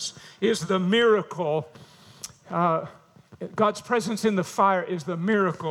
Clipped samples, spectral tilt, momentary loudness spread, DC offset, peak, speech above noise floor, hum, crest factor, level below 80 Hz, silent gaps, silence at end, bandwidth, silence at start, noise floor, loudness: under 0.1%; -5 dB/octave; 19 LU; under 0.1%; -8 dBFS; 21 dB; none; 18 dB; -72 dBFS; none; 0 s; 15.5 kHz; 0 s; -45 dBFS; -24 LUFS